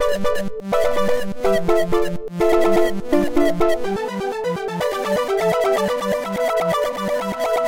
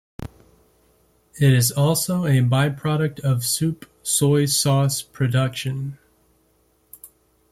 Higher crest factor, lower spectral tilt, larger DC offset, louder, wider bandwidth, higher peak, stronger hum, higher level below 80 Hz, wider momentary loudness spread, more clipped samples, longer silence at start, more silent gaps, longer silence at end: about the same, 16 dB vs 16 dB; about the same, -5.5 dB/octave vs -5 dB/octave; first, 5% vs under 0.1%; about the same, -20 LUFS vs -20 LUFS; about the same, 17 kHz vs 15.5 kHz; about the same, -4 dBFS vs -6 dBFS; neither; first, -38 dBFS vs -54 dBFS; second, 6 LU vs 13 LU; neither; second, 0 s vs 0.2 s; neither; second, 0 s vs 0.45 s